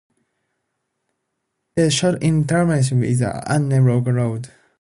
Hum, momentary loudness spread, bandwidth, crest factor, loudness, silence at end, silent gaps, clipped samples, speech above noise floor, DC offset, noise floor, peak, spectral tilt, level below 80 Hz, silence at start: none; 8 LU; 11.5 kHz; 14 dB; -18 LUFS; 0.35 s; none; under 0.1%; 58 dB; under 0.1%; -75 dBFS; -4 dBFS; -6 dB/octave; -50 dBFS; 1.75 s